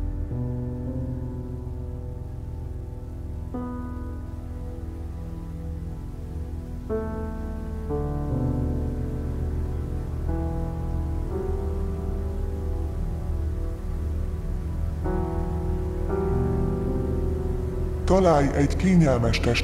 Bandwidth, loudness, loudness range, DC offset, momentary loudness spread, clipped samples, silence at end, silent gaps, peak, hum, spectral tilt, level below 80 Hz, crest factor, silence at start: 12.5 kHz; -28 LUFS; 10 LU; under 0.1%; 14 LU; under 0.1%; 0 s; none; -6 dBFS; none; -7.5 dB/octave; -32 dBFS; 20 dB; 0 s